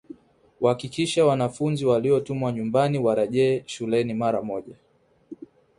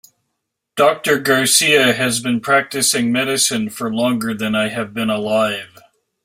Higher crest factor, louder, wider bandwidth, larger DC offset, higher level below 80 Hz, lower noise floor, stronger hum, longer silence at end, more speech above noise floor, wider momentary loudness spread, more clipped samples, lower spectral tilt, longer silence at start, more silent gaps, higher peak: about the same, 18 dB vs 18 dB; second, -24 LUFS vs -16 LUFS; second, 11.5 kHz vs 16 kHz; neither; about the same, -62 dBFS vs -58 dBFS; second, -52 dBFS vs -76 dBFS; neither; second, 0.35 s vs 0.6 s; second, 29 dB vs 59 dB; about the same, 10 LU vs 9 LU; neither; first, -6.5 dB/octave vs -2.5 dB/octave; second, 0.6 s vs 0.75 s; neither; second, -6 dBFS vs 0 dBFS